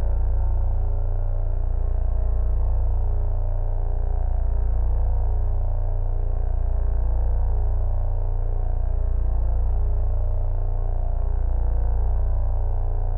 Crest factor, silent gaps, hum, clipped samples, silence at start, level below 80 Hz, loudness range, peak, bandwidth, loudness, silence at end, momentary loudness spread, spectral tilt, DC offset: 8 dB; none; none; under 0.1%; 0 s; -20 dBFS; 1 LU; -12 dBFS; 1.8 kHz; -27 LUFS; 0 s; 3 LU; -12 dB/octave; under 0.1%